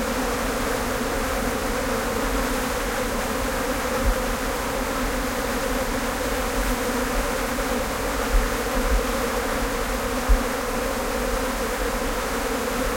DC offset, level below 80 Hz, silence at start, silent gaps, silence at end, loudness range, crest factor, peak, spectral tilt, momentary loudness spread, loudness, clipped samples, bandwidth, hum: under 0.1%; -30 dBFS; 0 s; none; 0 s; 1 LU; 18 dB; -6 dBFS; -4 dB/octave; 2 LU; -25 LUFS; under 0.1%; 16.5 kHz; none